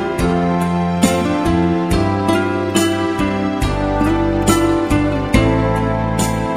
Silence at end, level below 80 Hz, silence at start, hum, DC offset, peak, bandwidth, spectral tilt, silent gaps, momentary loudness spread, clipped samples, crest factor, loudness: 0 s; -28 dBFS; 0 s; none; under 0.1%; 0 dBFS; 16 kHz; -6 dB/octave; none; 3 LU; under 0.1%; 16 dB; -16 LUFS